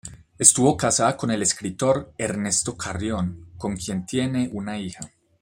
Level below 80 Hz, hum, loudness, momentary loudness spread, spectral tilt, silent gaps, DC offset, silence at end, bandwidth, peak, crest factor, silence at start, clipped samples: -52 dBFS; none; -22 LUFS; 16 LU; -3.5 dB/octave; none; under 0.1%; 0.35 s; 16 kHz; 0 dBFS; 24 dB; 0.05 s; under 0.1%